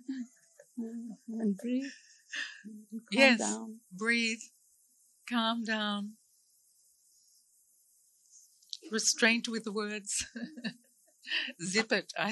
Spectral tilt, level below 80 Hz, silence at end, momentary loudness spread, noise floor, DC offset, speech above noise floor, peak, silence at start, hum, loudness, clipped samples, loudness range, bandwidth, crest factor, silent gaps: -2.5 dB/octave; -76 dBFS; 0 s; 20 LU; -68 dBFS; under 0.1%; 36 dB; -8 dBFS; 0.1 s; none; -32 LUFS; under 0.1%; 8 LU; 12 kHz; 26 dB; none